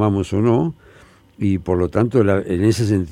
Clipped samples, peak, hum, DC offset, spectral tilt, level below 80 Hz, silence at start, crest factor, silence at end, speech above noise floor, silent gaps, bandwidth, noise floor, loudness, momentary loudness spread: under 0.1%; -2 dBFS; none; under 0.1%; -7.5 dB/octave; -48 dBFS; 0 s; 16 dB; 0 s; 31 dB; none; 13.5 kHz; -48 dBFS; -18 LUFS; 5 LU